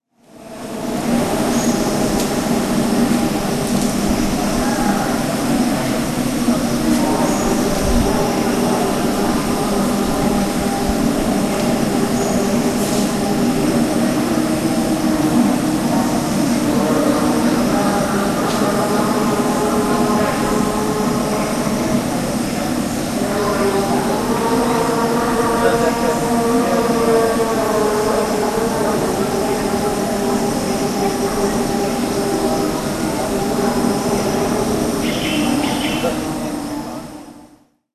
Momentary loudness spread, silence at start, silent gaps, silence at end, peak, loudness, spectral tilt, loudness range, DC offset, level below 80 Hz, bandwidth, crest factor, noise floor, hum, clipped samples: 3 LU; 0.35 s; none; 0.5 s; -2 dBFS; -17 LUFS; -5 dB/octave; 2 LU; under 0.1%; -36 dBFS; 14 kHz; 14 dB; -49 dBFS; none; under 0.1%